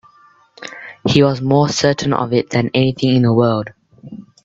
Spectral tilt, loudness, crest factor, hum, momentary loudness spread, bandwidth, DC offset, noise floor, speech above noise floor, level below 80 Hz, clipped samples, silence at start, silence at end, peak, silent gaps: -6 dB/octave; -15 LUFS; 16 dB; none; 20 LU; 7.8 kHz; under 0.1%; -50 dBFS; 36 dB; -50 dBFS; under 0.1%; 0.6 s; 0.25 s; 0 dBFS; none